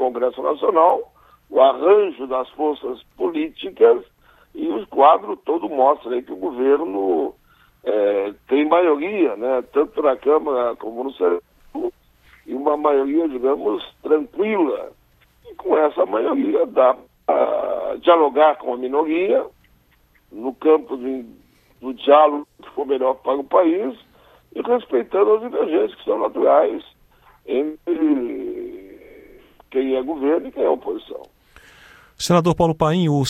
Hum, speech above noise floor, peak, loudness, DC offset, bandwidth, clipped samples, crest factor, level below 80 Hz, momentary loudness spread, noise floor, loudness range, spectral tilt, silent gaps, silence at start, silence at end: none; 39 dB; 0 dBFS; -19 LUFS; under 0.1%; 13.5 kHz; under 0.1%; 20 dB; -54 dBFS; 14 LU; -58 dBFS; 4 LU; -6.5 dB/octave; none; 0 s; 0 s